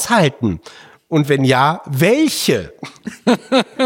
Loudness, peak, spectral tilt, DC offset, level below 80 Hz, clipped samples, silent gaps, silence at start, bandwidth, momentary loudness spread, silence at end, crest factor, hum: -16 LUFS; -2 dBFS; -5 dB/octave; under 0.1%; -50 dBFS; under 0.1%; none; 0 s; 17 kHz; 15 LU; 0 s; 14 dB; none